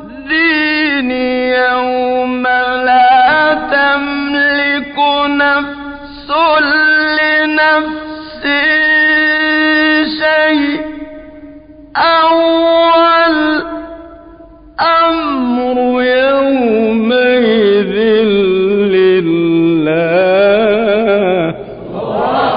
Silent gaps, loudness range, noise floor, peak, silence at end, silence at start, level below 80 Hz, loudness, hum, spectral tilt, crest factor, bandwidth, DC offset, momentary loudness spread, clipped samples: none; 2 LU; -37 dBFS; -2 dBFS; 0 s; 0 s; -44 dBFS; -11 LUFS; none; -10.5 dB/octave; 10 dB; 5.2 kHz; under 0.1%; 10 LU; under 0.1%